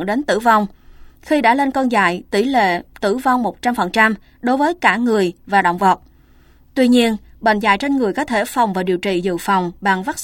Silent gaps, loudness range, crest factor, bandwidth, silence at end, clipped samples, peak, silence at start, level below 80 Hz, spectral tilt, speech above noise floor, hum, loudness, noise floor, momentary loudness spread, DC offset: none; 1 LU; 16 dB; 17 kHz; 0 s; under 0.1%; 0 dBFS; 0 s; -48 dBFS; -5 dB/octave; 32 dB; none; -17 LUFS; -49 dBFS; 6 LU; under 0.1%